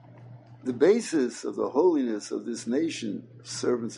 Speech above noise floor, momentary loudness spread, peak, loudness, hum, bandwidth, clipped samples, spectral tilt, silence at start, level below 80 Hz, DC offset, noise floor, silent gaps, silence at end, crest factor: 21 dB; 13 LU; -10 dBFS; -27 LUFS; none; 11.5 kHz; under 0.1%; -5 dB/octave; 0.05 s; -78 dBFS; under 0.1%; -48 dBFS; none; 0 s; 18 dB